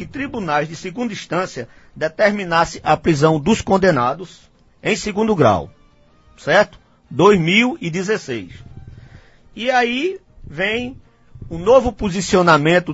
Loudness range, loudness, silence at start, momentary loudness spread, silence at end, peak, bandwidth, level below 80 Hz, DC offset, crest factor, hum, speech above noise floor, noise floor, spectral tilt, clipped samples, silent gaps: 5 LU; -17 LUFS; 0 s; 16 LU; 0 s; 0 dBFS; 8 kHz; -44 dBFS; under 0.1%; 18 dB; none; 34 dB; -51 dBFS; -5.5 dB/octave; under 0.1%; none